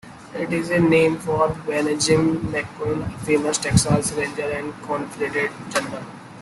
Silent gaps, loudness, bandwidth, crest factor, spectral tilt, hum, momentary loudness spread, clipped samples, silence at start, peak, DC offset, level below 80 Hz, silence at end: none; -21 LUFS; 12.5 kHz; 18 dB; -5 dB/octave; none; 10 LU; under 0.1%; 0.05 s; -4 dBFS; under 0.1%; -46 dBFS; 0 s